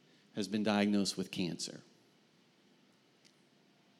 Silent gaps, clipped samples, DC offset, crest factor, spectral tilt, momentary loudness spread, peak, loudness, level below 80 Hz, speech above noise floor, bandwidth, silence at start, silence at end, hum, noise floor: none; under 0.1%; under 0.1%; 22 dB; -4.5 dB/octave; 13 LU; -16 dBFS; -35 LUFS; -84 dBFS; 34 dB; 14 kHz; 0.35 s; 2.2 s; none; -68 dBFS